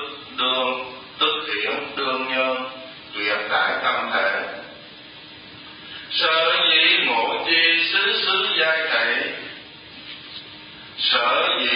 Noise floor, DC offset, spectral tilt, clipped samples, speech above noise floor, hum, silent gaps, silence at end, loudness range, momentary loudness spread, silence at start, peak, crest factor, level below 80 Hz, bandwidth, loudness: -42 dBFS; under 0.1%; -6.5 dB/octave; under 0.1%; 20 dB; none; none; 0 s; 7 LU; 23 LU; 0 s; -4 dBFS; 18 dB; -64 dBFS; 5.4 kHz; -19 LUFS